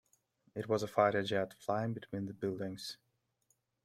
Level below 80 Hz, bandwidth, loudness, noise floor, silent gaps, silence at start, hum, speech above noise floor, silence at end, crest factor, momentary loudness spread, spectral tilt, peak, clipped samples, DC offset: -74 dBFS; 15 kHz; -36 LUFS; -79 dBFS; none; 0.55 s; none; 43 dB; 0.9 s; 22 dB; 15 LU; -6 dB/octave; -16 dBFS; under 0.1%; under 0.1%